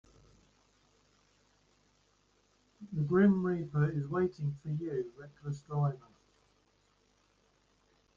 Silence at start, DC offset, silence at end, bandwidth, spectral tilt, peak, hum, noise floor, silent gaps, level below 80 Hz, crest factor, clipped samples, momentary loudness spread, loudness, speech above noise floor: 2.8 s; under 0.1%; 2.2 s; 7.2 kHz; -9.5 dB/octave; -16 dBFS; none; -71 dBFS; none; -68 dBFS; 20 dB; under 0.1%; 16 LU; -33 LUFS; 39 dB